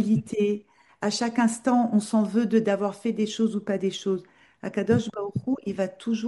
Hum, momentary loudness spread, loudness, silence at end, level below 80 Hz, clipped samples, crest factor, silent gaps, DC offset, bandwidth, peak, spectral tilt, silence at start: none; 8 LU; -26 LUFS; 0 s; -66 dBFS; under 0.1%; 16 dB; none; under 0.1%; 11.5 kHz; -10 dBFS; -6 dB/octave; 0 s